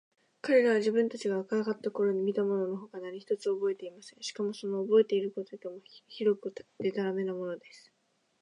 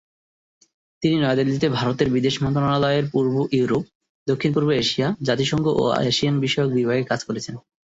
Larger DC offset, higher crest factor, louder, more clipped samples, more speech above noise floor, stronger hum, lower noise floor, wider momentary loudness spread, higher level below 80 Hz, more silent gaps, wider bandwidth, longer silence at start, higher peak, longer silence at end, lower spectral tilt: neither; about the same, 18 dB vs 16 dB; second, -31 LUFS vs -21 LUFS; neither; second, 44 dB vs over 69 dB; neither; second, -75 dBFS vs under -90 dBFS; first, 16 LU vs 6 LU; second, -86 dBFS vs -52 dBFS; second, none vs 3.95-4.01 s, 4.09-4.26 s; first, 10.5 kHz vs 8 kHz; second, 0.45 s vs 1 s; second, -14 dBFS vs -6 dBFS; first, 0.65 s vs 0.25 s; about the same, -5.5 dB/octave vs -6 dB/octave